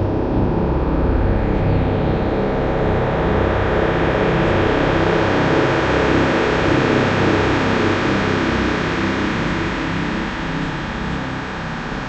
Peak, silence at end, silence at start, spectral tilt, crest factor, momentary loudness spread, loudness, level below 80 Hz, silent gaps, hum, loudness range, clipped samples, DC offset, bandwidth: -2 dBFS; 0 s; 0 s; -7 dB/octave; 14 dB; 7 LU; -18 LUFS; -28 dBFS; none; 50 Hz at -35 dBFS; 4 LU; under 0.1%; under 0.1%; 8.4 kHz